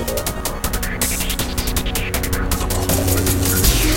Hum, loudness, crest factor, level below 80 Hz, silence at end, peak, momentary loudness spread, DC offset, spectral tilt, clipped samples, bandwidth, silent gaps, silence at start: none; -19 LUFS; 16 dB; -24 dBFS; 0 s; -2 dBFS; 7 LU; under 0.1%; -3.5 dB/octave; under 0.1%; 17.5 kHz; none; 0 s